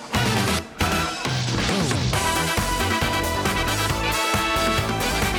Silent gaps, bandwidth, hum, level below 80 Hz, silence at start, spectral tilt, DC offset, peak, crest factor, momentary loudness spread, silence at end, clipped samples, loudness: none; over 20 kHz; none; -34 dBFS; 0 s; -3.5 dB/octave; under 0.1%; -10 dBFS; 12 dB; 3 LU; 0 s; under 0.1%; -22 LUFS